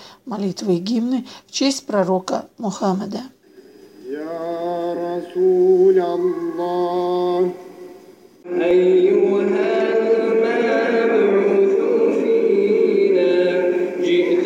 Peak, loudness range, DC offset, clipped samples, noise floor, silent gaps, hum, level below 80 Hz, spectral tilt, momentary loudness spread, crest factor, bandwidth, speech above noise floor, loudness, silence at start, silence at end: -4 dBFS; 7 LU; under 0.1%; under 0.1%; -45 dBFS; none; none; -68 dBFS; -5.5 dB/octave; 12 LU; 14 dB; 10.5 kHz; 27 dB; -18 LUFS; 0 s; 0 s